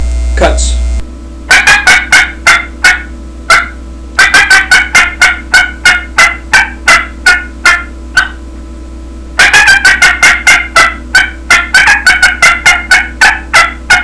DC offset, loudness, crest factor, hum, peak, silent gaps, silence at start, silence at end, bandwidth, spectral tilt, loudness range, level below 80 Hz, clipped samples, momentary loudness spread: 1%; -5 LUFS; 8 dB; none; 0 dBFS; none; 0 s; 0 s; 11 kHz; -1.5 dB/octave; 3 LU; -20 dBFS; 5%; 9 LU